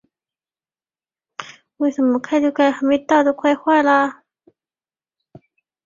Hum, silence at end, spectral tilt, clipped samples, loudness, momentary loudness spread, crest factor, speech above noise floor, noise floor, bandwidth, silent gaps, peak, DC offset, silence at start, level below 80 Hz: none; 1.75 s; -4.5 dB/octave; under 0.1%; -17 LUFS; 20 LU; 18 dB; over 74 dB; under -90 dBFS; 7.4 kHz; none; -2 dBFS; under 0.1%; 1.4 s; -66 dBFS